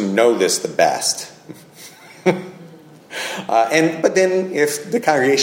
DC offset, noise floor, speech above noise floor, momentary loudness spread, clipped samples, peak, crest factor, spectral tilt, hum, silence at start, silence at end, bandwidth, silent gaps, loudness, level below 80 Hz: under 0.1%; -42 dBFS; 25 dB; 18 LU; under 0.1%; 0 dBFS; 18 dB; -3.5 dB/octave; none; 0 s; 0 s; 16.5 kHz; none; -18 LUFS; -66 dBFS